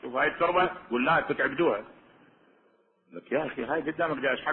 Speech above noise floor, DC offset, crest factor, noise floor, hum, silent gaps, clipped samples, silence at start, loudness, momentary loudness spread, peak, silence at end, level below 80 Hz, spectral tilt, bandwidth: 39 dB; under 0.1%; 18 dB; -66 dBFS; none; none; under 0.1%; 0 s; -28 LUFS; 7 LU; -12 dBFS; 0 s; -62 dBFS; -9 dB/octave; 4.2 kHz